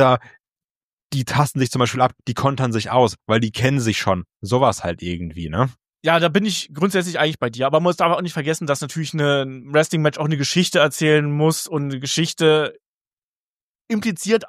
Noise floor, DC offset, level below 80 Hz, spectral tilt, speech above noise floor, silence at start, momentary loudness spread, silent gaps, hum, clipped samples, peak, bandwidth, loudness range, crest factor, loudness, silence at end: under -90 dBFS; under 0.1%; -52 dBFS; -5 dB/octave; over 71 dB; 0 s; 8 LU; 0.64-0.97 s, 1.03-1.10 s, 12.86-13.17 s, 13.23-13.85 s; none; under 0.1%; -2 dBFS; 15.5 kHz; 2 LU; 18 dB; -20 LUFS; 0 s